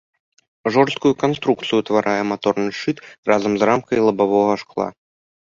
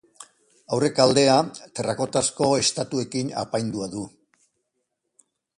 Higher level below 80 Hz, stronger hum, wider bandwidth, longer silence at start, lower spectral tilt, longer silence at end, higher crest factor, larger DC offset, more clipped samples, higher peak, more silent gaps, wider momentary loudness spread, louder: about the same, -60 dBFS vs -60 dBFS; neither; second, 7.4 kHz vs 11.5 kHz; first, 0.65 s vs 0.2 s; first, -6 dB/octave vs -4 dB/octave; second, 0.55 s vs 1.5 s; about the same, 18 dB vs 22 dB; neither; neither; about the same, -2 dBFS vs -2 dBFS; first, 3.18-3.23 s vs none; second, 9 LU vs 13 LU; first, -19 LUFS vs -23 LUFS